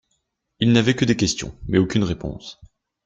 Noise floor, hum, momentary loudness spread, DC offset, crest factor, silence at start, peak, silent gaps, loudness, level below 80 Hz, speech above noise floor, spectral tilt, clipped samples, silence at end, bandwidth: -73 dBFS; none; 15 LU; under 0.1%; 20 dB; 0.6 s; -2 dBFS; none; -20 LUFS; -44 dBFS; 53 dB; -5 dB/octave; under 0.1%; 0.55 s; 9.2 kHz